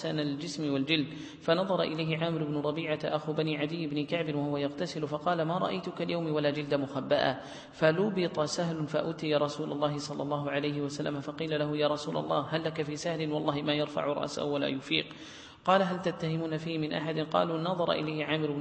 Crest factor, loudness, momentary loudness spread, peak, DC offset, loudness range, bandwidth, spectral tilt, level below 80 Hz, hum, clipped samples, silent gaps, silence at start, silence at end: 20 dB; -31 LUFS; 6 LU; -10 dBFS; under 0.1%; 2 LU; 8.8 kHz; -5.5 dB/octave; -68 dBFS; none; under 0.1%; none; 0 s; 0 s